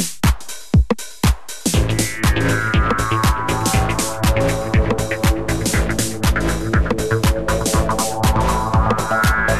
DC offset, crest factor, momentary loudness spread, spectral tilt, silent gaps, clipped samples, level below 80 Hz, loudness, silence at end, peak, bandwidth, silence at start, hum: 2%; 12 dB; 3 LU; -4.5 dB/octave; none; under 0.1%; -22 dBFS; -18 LUFS; 0 s; -6 dBFS; 14.5 kHz; 0 s; none